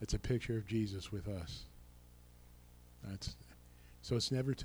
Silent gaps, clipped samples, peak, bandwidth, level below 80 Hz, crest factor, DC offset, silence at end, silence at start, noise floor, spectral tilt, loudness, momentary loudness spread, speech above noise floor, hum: none; under 0.1%; -24 dBFS; over 20 kHz; -52 dBFS; 16 dB; under 0.1%; 0 s; 0 s; -60 dBFS; -5.5 dB/octave; -40 LUFS; 25 LU; 21 dB; 60 Hz at -60 dBFS